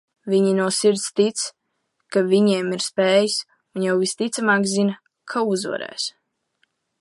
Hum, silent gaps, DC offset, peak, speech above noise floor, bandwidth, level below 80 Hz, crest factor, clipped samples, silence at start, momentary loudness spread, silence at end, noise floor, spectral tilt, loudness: none; none; under 0.1%; -4 dBFS; 53 dB; 11.5 kHz; -74 dBFS; 18 dB; under 0.1%; 0.25 s; 10 LU; 0.9 s; -73 dBFS; -4 dB/octave; -21 LUFS